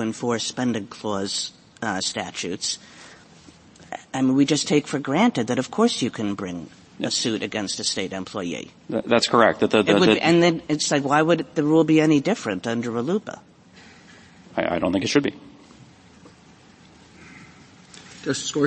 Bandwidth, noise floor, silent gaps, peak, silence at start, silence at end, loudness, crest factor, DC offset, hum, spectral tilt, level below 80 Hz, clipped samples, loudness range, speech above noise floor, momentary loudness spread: 8.8 kHz; -50 dBFS; none; 0 dBFS; 0 s; 0 s; -22 LUFS; 22 dB; under 0.1%; none; -4.5 dB/octave; -60 dBFS; under 0.1%; 9 LU; 29 dB; 14 LU